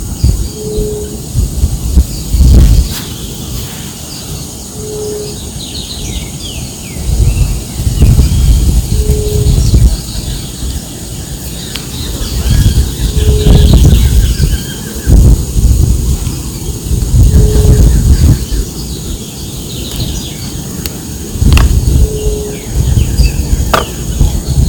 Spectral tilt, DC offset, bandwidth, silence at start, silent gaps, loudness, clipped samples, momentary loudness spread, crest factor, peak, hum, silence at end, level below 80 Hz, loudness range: -5.5 dB/octave; under 0.1%; 19 kHz; 0 s; none; -12 LUFS; 4%; 13 LU; 10 dB; 0 dBFS; none; 0 s; -12 dBFS; 8 LU